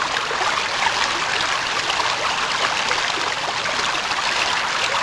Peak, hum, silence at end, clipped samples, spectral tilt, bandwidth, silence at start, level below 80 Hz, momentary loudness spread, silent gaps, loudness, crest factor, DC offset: -4 dBFS; none; 0 s; under 0.1%; -0.5 dB/octave; 11 kHz; 0 s; -52 dBFS; 2 LU; none; -20 LUFS; 18 dB; under 0.1%